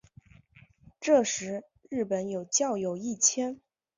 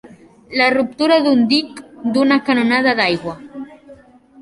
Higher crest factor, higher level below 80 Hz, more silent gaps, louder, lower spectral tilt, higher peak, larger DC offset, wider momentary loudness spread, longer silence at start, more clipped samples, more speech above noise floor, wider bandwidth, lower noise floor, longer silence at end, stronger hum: about the same, 20 dB vs 16 dB; second, -70 dBFS vs -58 dBFS; neither; second, -28 LUFS vs -15 LUFS; second, -3 dB/octave vs -5 dB/octave; second, -10 dBFS vs -2 dBFS; neither; second, 13 LU vs 19 LU; first, 1 s vs 0.05 s; neither; about the same, 30 dB vs 29 dB; second, 7.8 kHz vs 11.5 kHz; first, -58 dBFS vs -44 dBFS; first, 0.4 s vs 0 s; neither